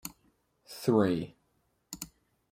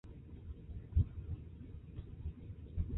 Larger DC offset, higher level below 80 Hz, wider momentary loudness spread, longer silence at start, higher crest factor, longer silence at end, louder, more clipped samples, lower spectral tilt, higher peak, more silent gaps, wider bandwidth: neither; second, -66 dBFS vs -44 dBFS; first, 20 LU vs 15 LU; about the same, 0.05 s vs 0.05 s; about the same, 22 dB vs 20 dB; first, 0.45 s vs 0 s; first, -29 LUFS vs -44 LUFS; neither; second, -6 dB/octave vs -12.5 dB/octave; first, -12 dBFS vs -22 dBFS; neither; first, 16 kHz vs 3.9 kHz